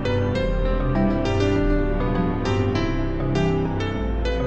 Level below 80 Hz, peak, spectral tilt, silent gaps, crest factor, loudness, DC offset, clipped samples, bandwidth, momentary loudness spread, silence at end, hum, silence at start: -26 dBFS; -8 dBFS; -7.5 dB/octave; none; 12 dB; -23 LUFS; 0.9%; under 0.1%; 8.2 kHz; 4 LU; 0 s; none; 0 s